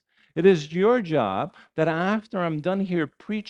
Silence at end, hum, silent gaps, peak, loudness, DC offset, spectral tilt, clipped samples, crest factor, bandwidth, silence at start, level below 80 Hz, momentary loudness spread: 0 s; none; none; -6 dBFS; -24 LUFS; under 0.1%; -7.5 dB/octave; under 0.1%; 18 dB; 7.8 kHz; 0.35 s; -64 dBFS; 10 LU